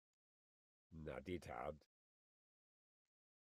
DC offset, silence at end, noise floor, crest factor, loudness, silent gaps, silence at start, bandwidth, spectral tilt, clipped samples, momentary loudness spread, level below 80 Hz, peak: under 0.1%; 1.65 s; under -90 dBFS; 24 dB; -52 LUFS; none; 0.9 s; 13 kHz; -6.5 dB/octave; under 0.1%; 13 LU; -72 dBFS; -34 dBFS